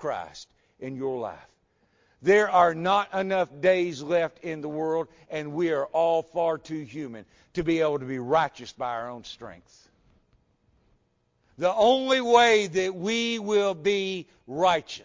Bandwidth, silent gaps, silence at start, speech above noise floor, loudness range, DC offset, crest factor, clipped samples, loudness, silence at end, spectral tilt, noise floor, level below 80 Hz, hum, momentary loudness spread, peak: 7.6 kHz; none; 0 s; 45 dB; 7 LU; under 0.1%; 20 dB; under 0.1%; -25 LUFS; 0.05 s; -4.5 dB/octave; -70 dBFS; -62 dBFS; none; 17 LU; -6 dBFS